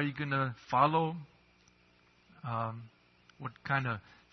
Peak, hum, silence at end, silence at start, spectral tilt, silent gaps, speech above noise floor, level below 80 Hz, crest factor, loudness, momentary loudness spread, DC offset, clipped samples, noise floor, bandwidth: -14 dBFS; 60 Hz at -65 dBFS; 0.3 s; 0 s; -5 dB/octave; none; 33 dB; -70 dBFS; 22 dB; -33 LUFS; 18 LU; under 0.1%; under 0.1%; -66 dBFS; 6.2 kHz